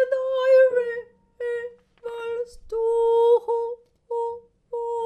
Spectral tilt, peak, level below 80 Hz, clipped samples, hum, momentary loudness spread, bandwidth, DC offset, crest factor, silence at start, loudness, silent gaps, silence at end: -3 dB/octave; -8 dBFS; -58 dBFS; under 0.1%; none; 18 LU; 8.8 kHz; under 0.1%; 14 dB; 0 s; -23 LUFS; none; 0 s